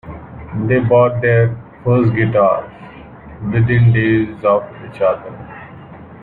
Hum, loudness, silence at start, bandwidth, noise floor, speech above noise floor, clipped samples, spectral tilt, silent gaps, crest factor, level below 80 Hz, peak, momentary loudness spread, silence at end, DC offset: none; -15 LUFS; 0.05 s; 4.1 kHz; -36 dBFS; 22 dB; under 0.1%; -11 dB/octave; none; 14 dB; -42 dBFS; -2 dBFS; 21 LU; 0 s; under 0.1%